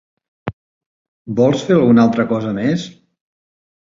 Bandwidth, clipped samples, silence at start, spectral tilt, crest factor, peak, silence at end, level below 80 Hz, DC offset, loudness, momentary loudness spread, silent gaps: 7.6 kHz; under 0.1%; 0.45 s; -7.5 dB/octave; 16 dB; 0 dBFS; 1.05 s; -52 dBFS; under 0.1%; -15 LUFS; 19 LU; 0.53-1.25 s